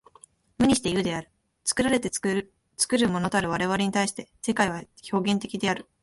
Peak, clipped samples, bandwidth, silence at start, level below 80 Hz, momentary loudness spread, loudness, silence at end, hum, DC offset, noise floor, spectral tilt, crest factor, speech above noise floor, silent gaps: -8 dBFS; under 0.1%; 12 kHz; 0.6 s; -54 dBFS; 8 LU; -26 LUFS; 0.2 s; none; under 0.1%; -56 dBFS; -4 dB/octave; 18 dB; 31 dB; none